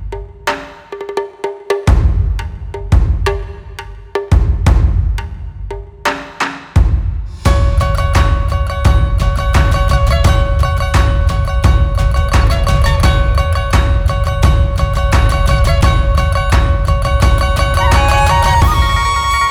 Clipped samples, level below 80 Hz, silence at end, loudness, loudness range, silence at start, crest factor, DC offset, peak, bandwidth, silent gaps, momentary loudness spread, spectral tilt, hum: under 0.1%; -14 dBFS; 0 s; -14 LUFS; 5 LU; 0 s; 12 dB; under 0.1%; 0 dBFS; 15 kHz; none; 11 LU; -5.5 dB/octave; none